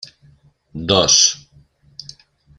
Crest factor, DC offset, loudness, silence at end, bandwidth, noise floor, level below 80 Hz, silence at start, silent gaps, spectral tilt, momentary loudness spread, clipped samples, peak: 20 dB; under 0.1%; -13 LUFS; 1.2 s; 13 kHz; -52 dBFS; -50 dBFS; 0.75 s; none; -1.5 dB/octave; 26 LU; under 0.1%; 0 dBFS